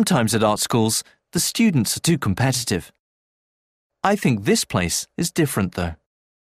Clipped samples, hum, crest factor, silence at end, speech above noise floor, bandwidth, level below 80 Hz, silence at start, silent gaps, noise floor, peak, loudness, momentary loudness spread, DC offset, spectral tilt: under 0.1%; none; 18 dB; 0.65 s; over 70 dB; 15.5 kHz; -48 dBFS; 0 s; 2.99-3.90 s; under -90 dBFS; -4 dBFS; -21 LUFS; 7 LU; under 0.1%; -4.5 dB/octave